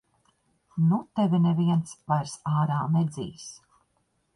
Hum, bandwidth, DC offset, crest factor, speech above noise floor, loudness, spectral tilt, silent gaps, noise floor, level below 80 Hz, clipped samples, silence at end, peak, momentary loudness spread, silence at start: none; 11 kHz; under 0.1%; 16 dB; 47 dB; -26 LUFS; -7.5 dB/octave; none; -72 dBFS; -64 dBFS; under 0.1%; 0.8 s; -12 dBFS; 15 LU; 0.75 s